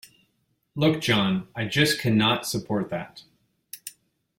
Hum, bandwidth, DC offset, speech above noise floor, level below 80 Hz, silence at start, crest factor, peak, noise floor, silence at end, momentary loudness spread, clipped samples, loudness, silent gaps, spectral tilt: none; 16.5 kHz; under 0.1%; 48 dB; -58 dBFS; 0.75 s; 18 dB; -8 dBFS; -72 dBFS; 0.5 s; 18 LU; under 0.1%; -24 LUFS; none; -4.5 dB/octave